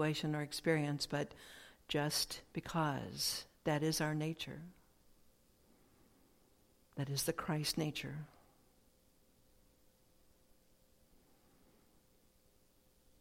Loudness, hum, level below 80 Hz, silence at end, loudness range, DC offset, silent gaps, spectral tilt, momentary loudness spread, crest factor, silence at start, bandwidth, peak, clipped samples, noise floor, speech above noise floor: -39 LUFS; none; -68 dBFS; 4.95 s; 8 LU; under 0.1%; none; -4 dB/octave; 17 LU; 22 dB; 0 s; 16.5 kHz; -20 dBFS; under 0.1%; -71 dBFS; 32 dB